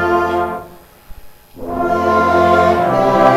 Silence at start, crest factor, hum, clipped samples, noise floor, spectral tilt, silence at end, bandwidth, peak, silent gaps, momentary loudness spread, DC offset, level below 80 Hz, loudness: 0 s; 14 dB; none; under 0.1%; -38 dBFS; -6.5 dB/octave; 0 s; 15 kHz; 0 dBFS; none; 14 LU; under 0.1%; -40 dBFS; -14 LUFS